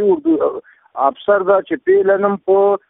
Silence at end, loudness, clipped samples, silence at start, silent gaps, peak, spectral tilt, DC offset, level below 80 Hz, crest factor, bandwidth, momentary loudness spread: 0.1 s; -15 LUFS; under 0.1%; 0 s; none; -2 dBFS; -11 dB/octave; under 0.1%; -60 dBFS; 14 dB; 3.8 kHz; 7 LU